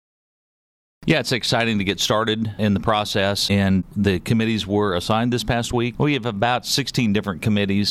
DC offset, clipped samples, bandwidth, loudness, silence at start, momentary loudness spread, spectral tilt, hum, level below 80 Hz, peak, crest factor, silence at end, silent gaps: under 0.1%; under 0.1%; 14.5 kHz; -20 LUFS; 1 s; 3 LU; -5 dB/octave; none; -44 dBFS; -6 dBFS; 14 dB; 0 s; none